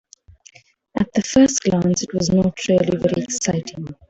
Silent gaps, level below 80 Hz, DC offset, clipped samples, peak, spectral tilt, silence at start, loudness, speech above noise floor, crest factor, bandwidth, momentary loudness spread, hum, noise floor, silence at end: none; -48 dBFS; under 0.1%; under 0.1%; -4 dBFS; -5 dB/octave; 0.95 s; -19 LUFS; 32 dB; 16 dB; 8.2 kHz; 9 LU; none; -50 dBFS; 0.15 s